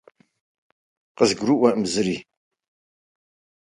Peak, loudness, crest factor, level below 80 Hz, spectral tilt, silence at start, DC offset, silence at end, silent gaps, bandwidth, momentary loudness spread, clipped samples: -2 dBFS; -21 LUFS; 22 dB; -62 dBFS; -4.5 dB/octave; 1.2 s; under 0.1%; 1.4 s; none; 11.5 kHz; 7 LU; under 0.1%